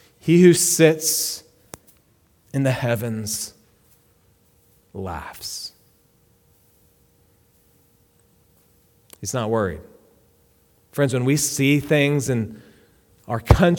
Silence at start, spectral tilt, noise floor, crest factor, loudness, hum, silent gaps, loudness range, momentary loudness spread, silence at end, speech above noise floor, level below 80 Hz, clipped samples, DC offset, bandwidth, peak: 0.25 s; -5 dB/octave; -60 dBFS; 22 dB; -20 LUFS; none; none; 16 LU; 19 LU; 0 s; 41 dB; -38 dBFS; under 0.1%; under 0.1%; 19 kHz; 0 dBFS